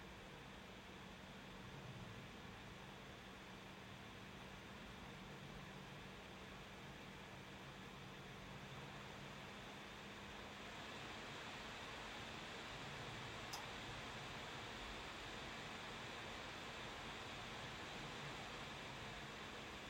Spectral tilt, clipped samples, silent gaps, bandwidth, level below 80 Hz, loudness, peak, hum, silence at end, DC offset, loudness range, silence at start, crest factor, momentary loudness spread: -3.5 dB/octave; under 0.1%; none; 16 kHz; -68 dBFS; -52 LUFS; -34 dBFS; none; 0 s; under 0.1%; 5 LU; 0 s; 20 dB; 6 LU